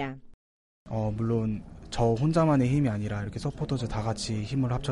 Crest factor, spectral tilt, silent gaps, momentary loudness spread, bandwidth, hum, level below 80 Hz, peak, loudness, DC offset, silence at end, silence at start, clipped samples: 16 dB; -7 dB/octave; 0.34-0.86 s; 13 LU; 11.5 kHz; none; -46 dBFS; -12 dBFS; -28 LUFS; under 0.1%; 0 s; 0 s; under 0.1%